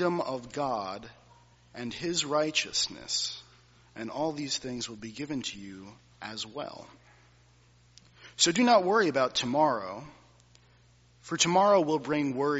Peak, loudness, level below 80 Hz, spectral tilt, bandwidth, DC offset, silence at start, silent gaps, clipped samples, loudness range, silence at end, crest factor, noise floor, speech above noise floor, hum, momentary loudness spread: -8 dBFS; -28 LUFS; -66 dBFS; -2.5 dB/octave; 8 kHz; under 0.1%; 0 s; none; under 0.1%; 10 LU; 0 s; 22 dB; -61 dBFS; 32 dB; 60 Hz at -55 dBFS; 20 LU